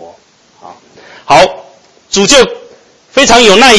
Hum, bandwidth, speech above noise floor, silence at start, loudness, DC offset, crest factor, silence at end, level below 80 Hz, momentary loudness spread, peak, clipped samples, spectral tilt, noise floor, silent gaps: none; 11 kHz; 40 dB; 0 s; -6 LUFS; under 0.1%; 10 dB; 0 s; -36 dBFS; 11 LU; 0 dBFS; 5%; -2 dB/octave; -44 dBFS; none